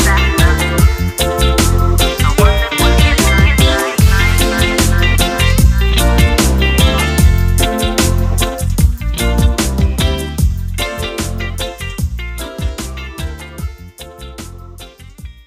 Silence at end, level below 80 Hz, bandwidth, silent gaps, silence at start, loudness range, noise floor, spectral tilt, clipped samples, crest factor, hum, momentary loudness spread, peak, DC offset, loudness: 0.15 s; -16 dBFS; 16 kHz; none; 0 s; 12 LU; -34 dBFS; -4.5 dB/octave; under 0.1%; 12 dB; none; 14 LU; 0 dBFS; under 0.1%; -13 LUFS